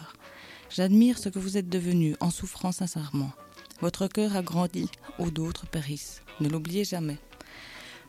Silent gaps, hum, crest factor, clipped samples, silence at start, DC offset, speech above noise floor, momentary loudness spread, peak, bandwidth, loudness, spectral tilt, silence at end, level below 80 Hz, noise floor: none; none; 18 dB; under 0.1%; 0 s; under 0.1%; 21 dB; 20 LU; -12 dBFS; 15.5 kHz; -29 LUFS; -6 dB/octave; 0.05 s; -52 dBFS; -48 dBFS